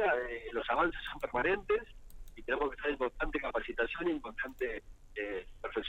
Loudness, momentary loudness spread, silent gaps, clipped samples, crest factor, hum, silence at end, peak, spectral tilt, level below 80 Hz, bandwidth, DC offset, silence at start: -35 LUFS; 10 LU; none; under 0.1%; 18 dB; none; 0 s; -18 dBFS; -5.5 dB/octave; -50 dBFS; 15.5 kHz; under 0.1%; 0 s